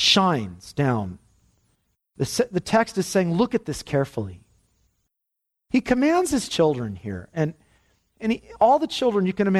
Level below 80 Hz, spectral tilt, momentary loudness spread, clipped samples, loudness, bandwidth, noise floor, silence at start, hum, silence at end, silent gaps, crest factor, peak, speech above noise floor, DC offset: -52 dBFS; -5 dB/octave; 12 LU; under 0.1%; -23 LUFS; 14 kHz; -81 dBFS; 0 s; none; 0 s; none; 18 dB; -6 dBFS; 59 dB; under 0.1%